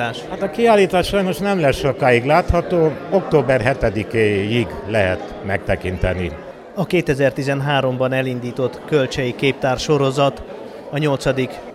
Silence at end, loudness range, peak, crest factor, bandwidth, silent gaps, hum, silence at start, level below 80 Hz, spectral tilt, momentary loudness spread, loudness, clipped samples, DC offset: 0 s; 4 LU; -2 dBFS; 16 dB; 15 kHz; none; none; 0 s; -36 dBFS; -6 dB/octave; 9 LU; -18 LUFS; under 0.1%; under 0.1%